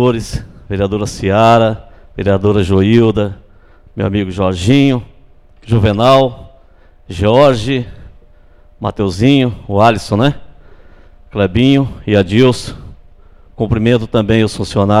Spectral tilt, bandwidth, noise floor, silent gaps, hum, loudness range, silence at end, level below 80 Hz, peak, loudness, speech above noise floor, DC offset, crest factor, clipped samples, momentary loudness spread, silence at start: -7 dB/octave; 12.5 kHz; -43 dBFS; none; none; 2 LU; 0 s; -34 dBFS; 0 dBFS; -13 LUFS; 31 dB; under 0.1%; 14 dB; under 0.1%; 14 LU; 0 s